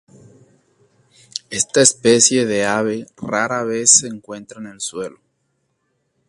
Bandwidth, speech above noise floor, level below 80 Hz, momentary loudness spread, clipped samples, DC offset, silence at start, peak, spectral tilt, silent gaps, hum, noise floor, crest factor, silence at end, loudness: 11.5 kHz; 51 dB; -60 dBFS; 20 LU; under 0.1%; under 0.1%; 1.35 s; 0 dBFS; -2 dB/octave; none; none; -69 dBFS; 20 dB; 1.2 s; -15 LUFS